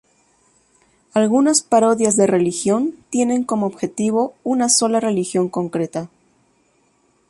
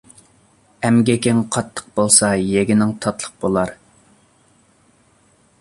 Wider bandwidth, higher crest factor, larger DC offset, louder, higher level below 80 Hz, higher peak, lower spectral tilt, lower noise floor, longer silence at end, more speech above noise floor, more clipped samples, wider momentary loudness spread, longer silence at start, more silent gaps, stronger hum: about the same, 11.5 kHz vs 11.5 kHz; about the same, 16 dB vs 20 dB; neither; about the same, -18 LUFS vs -17 LUFS; second, -62 dBFS vs -50 dBFS; about the same, -2 dBFS vs 0 dBFS; about the same, -4 dB/octave vs -4.5 dB/octave; first, -61 dBFS vs -56 dBFS; second, 1.25 s vs 1.85 s; first, 43 dB vs 39 dB; neither; second, 9 LU vs 12 LU; first, 1.15 s vs 0.8 s; neither; neither